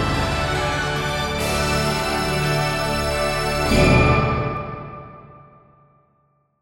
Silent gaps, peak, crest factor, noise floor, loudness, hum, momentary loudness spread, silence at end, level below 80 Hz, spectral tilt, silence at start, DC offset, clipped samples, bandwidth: none; -2 dBFS; 18 dB; -64 dBFS; -20 LUFS; none; 14 LU; 1.25 s; -32 dBFS; -5 dB/octave; 0 s; under 0.1%; under 0.1%; 16.5 kHz